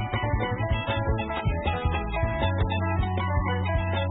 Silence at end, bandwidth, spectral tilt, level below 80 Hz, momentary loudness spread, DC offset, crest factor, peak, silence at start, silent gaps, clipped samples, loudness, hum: 0 s; 4 kHz; -11 dB/octave; -32 dBFS; 2 LU; under 0.1%; 12 dB; -14 dBFS; 0 s; none; under 0.1%; -27 LUFS; none